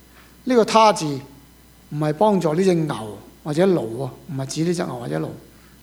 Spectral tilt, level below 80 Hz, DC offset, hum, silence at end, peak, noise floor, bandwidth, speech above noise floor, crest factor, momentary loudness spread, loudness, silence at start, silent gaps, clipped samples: -6 dB/octave; -54 dBFS; under 0.1%; none; 0.45 s; 0 dBFS; -49 dBFS; over 20 kHz; 29 dB; 22 dB; 17 LU; -20 LUFS; 0.45 s; none; under 0.1%